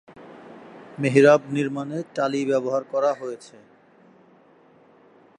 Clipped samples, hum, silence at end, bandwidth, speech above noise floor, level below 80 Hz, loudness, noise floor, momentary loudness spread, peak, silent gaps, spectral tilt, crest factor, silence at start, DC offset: under 0.1%; none; 1.95 s; 10.5 kHz; 33 dB; -76 dBFS; -22 LUFS; -55 dBFS; 27 LU; -2 dBFS; none; -6.5 dB/octave; 22 dB; 0.2 s; under 0.1%